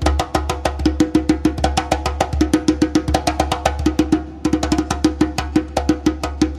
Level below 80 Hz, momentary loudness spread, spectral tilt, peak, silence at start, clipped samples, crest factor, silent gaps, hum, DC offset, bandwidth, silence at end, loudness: -26 dBFS; 4 LU; -5.5 dB/octave; -2 dBFS; 0 s; under 0.1%; 16 dB; none; none; under 0.1%; 14 kHz; 0 s; -19 LUFS